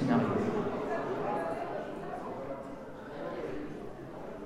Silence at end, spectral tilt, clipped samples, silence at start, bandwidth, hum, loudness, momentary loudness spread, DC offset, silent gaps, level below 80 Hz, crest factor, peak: 0 s; -7.5 dB/octave; under 0.1%; 0 s; 13 kHz; none; -36 LUFS; 13 LU; 0.1%; none; -58 dBFS; 20 dB; -14 dBFS